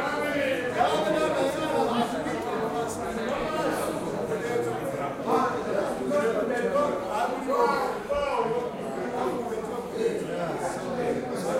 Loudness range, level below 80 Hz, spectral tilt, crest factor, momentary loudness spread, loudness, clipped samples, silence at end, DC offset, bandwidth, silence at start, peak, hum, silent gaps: 3 LU; -56 dBFS; -5 dB/octave; 16 dB; 6 LU; -28 LUFS; under 0.1%; 0 s; under 0.1%; 16 kHz; 0 s; -12 dBFS; none; none